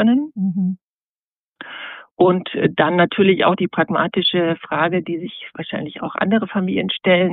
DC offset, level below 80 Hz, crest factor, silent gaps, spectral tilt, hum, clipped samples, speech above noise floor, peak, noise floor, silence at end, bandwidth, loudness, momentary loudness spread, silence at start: under 0.1%; -62 dBFS; 18 dB; 0.81-1.52 s, 2.11-2.16 s; -4 dB/octave; none; under 0.1%; over 72 dB; -2 dBFS; under -90 dBFS; 0 s; 4.5 kHz; -18 LUFS; 16 LU; 0 s